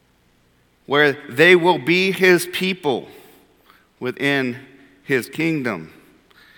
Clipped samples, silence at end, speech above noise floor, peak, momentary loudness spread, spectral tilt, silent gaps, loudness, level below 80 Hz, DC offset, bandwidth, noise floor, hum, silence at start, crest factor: under 0.1%; 0.7 s; 41 dB; 0 dBFS; 14 LU; -5 dB/octave; none; -18 LUFS; -66 dBFS; under 0.1%; 19 kHz; -59 dBFS; none; 0.9 s; 20 dB